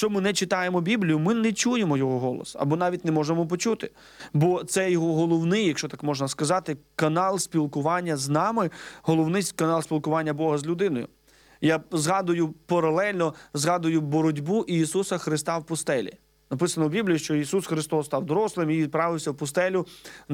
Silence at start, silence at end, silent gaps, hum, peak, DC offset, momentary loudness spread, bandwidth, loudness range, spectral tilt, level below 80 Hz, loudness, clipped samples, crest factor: 0 s; 0 s; none; none; -10 dBFS; under 0.1%; 5 LU; 16.5 kHz; 2 LU; -5 dB/octave; -64 dBFS; -25 LUFS; under 0.1%; 16 dB